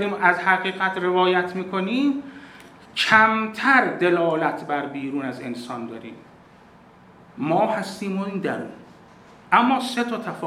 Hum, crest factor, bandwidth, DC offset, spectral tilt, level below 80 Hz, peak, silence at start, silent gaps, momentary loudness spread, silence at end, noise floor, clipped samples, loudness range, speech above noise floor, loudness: none; 22 dB; 14 kHz; under 0.1%; -5 dB/octave; -68 dBFS; 0 dBFS; 0 s; none; 15 LU; 0 s; -50 dBFS; under 0.1%; 8 LU; 28 dB; -21 LUFS